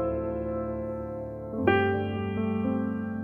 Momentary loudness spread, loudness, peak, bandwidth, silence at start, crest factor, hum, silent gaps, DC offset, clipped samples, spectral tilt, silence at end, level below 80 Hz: 11 LU; -29 LUFS; -8 dBFS; 4.7 kHz; 0 s; 20 dB; none; none; under 0.1%; under 0.1%; -9.5 dB/octave; 0 s; -48 dBFS